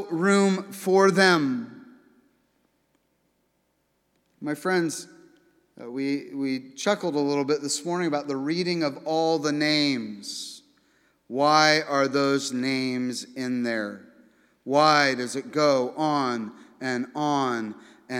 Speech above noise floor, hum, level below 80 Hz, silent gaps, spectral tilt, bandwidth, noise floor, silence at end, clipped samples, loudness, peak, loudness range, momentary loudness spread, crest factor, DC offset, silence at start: 47 dB; none; -82 dBFS; none; -4 dB/octave; 16 kHz; -72 dBFS; 0 s; under 0.1%; -24 LUFS; -4 dBFS; 9 LU; 15 LU; 22 dB; under 0.1%; 0 s